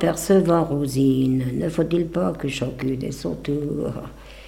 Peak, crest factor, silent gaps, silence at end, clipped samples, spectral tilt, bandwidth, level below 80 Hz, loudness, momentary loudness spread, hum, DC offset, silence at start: -6 dBFS; 16 dB; none; 0 s; under 0.1%; -6.5 dB/octave; 16.5 kHz; -44 dBFS; -22 LUFS; 10 LU; none; under 0.1%; 0 s